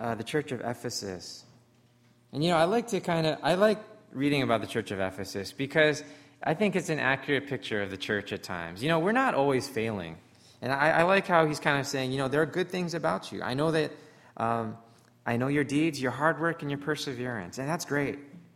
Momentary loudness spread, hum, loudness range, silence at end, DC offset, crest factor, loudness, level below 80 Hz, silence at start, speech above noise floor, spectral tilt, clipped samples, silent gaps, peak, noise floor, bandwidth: 12 LU; none; 4 LU; 0.15 s; under 0.1%; 22 dB; -29 LUFS; -64 dBFS; 0 s; 34 dB; -5 dB/octave; under 0.1%; none; -8 dBFS; -62 dBFS; 16 kHz